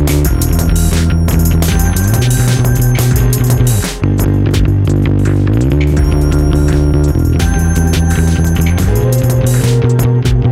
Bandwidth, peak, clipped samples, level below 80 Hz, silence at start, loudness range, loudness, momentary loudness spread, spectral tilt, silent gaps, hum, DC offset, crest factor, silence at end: 16.5 kHz; 0 dBFS; under 0.1%; -16 dBFS; 0 s; 0 LU; -12 LUFS; 1 LU; -6 dB/octave; none; none; under 0.1%; 10 dB; 0 s